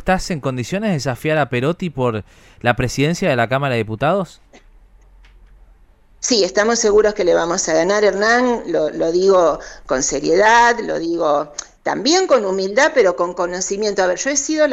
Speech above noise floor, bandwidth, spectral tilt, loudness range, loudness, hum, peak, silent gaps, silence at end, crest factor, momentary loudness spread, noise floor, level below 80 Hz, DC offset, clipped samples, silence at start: 32 dB; 14 kHz; -4 dB/octave; 5 LU; -17 LUFS; none; 0 dBFS; none; 0 s; 16 dB; 8 LU; -49 dBFS; -42 dBFS; under 0.1%; under 0.1%; 0 s